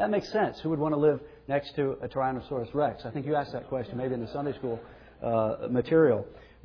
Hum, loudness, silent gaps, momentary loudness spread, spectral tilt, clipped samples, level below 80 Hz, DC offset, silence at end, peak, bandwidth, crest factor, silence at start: none; -29 LUFS; none; 10 LU; -8.5 dB/octave; under 0.1%; -56 dBFS; under 0.1%; 0.2 s; -12 dBFS; 5.4 kHz; 18 dB; 0 s